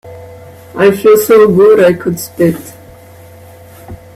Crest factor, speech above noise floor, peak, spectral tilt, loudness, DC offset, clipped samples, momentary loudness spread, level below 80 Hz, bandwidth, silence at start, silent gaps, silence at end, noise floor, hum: 10 dB; 27 dB; 0 dBFS; -6 dB/octave; -8 LUFS; under 0.1%; under 0.1%; 12 LU; -46 dBFS; 16 kHz; 0.05 s; none; 0.2 s; -35 dBFS; none